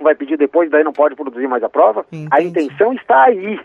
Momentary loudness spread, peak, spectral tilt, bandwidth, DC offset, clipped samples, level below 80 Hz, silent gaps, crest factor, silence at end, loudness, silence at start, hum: 8 LU; 0 dBFS; -7.5 dB/octave; 7.6 kHz; under 0.1%; under 0.1%; -70 dBFS; none; 14 dB; 0 s; -14 LUFS; 0 s; none